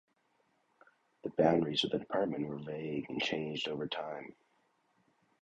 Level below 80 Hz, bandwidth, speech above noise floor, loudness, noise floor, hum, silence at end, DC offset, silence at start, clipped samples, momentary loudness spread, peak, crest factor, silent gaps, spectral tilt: -70 dBFS; 8.8 kHz; 41 dB; -35 LUFS; -75 dBFS; none; 1.1 s; under 0.1%; 1.25 s; under 0.1%; 13 LU; -14 dBFS; 24 dB; none; -5.5 dB/octave